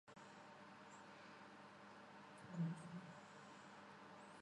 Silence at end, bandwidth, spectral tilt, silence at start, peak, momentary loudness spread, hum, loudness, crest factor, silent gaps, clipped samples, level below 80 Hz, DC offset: 0 s; 11 kHz; -6 dB/octave; 0.05 s; -36 dBFS; 13 LU; none; -56 LUFS; 20 dB; none; under 0.1%; under -90 dBFS; under 0.1%